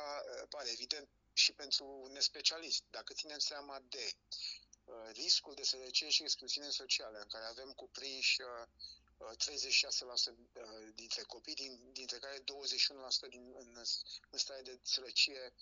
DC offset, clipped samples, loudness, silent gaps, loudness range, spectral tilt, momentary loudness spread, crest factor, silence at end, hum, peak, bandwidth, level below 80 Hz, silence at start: under 0.1%; under 0.1%; -37 LUFS; none; 4 LU; 2 dB/octave; 19 LU; 24 dB; 0.1 s; none; -16 dBFS; 9 kHz; -76 dBFS; 0 s